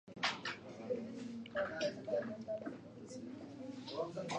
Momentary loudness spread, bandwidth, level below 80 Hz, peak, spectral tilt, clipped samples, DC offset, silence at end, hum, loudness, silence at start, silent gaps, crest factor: 11 LU; 10 kHz; -76 dBFS; -22 dBFS; -4 dB/octave; under 0.1%; under 0.1%; 0 s; none; -43 LUFS; 0.05 s; none; 20 dB